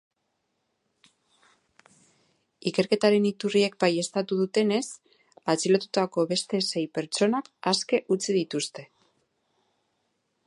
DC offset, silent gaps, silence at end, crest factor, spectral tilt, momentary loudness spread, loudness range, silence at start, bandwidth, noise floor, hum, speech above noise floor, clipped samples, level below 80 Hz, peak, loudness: under 0.1%; none; 1.65 s; 20 dB; -4.5 dB/octave; 8 LU; 4 LU; 2.65 s; 11.5 kHz; -77 dBFS; none; 52 dB; under 0.1%; -78 dBFS; -8 dBFS; -26 LUFS